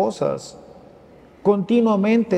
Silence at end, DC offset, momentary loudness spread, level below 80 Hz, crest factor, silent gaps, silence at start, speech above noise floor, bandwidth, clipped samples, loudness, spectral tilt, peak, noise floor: 0 s; under 0.1%; 12 LU; -60 dBFS; 16 dB; none; 0 s; 29 dB; 9.4 kHz; under 0.1%; -20 LUFS; -7 dB/octave; -6 dBFS; -47 dBFS